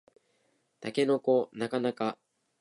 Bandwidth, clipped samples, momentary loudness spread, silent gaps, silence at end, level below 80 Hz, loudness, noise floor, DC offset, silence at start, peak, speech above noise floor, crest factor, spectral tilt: 11.5 kHz; under 0.1%; 12 LU; none; 0.45 s; -84 dBFS; -30 LUFS; -73 dBFS; under 0.1%; 0.8 s; -14 dBFS; 44 dB; 18 dB; -6 dB/octave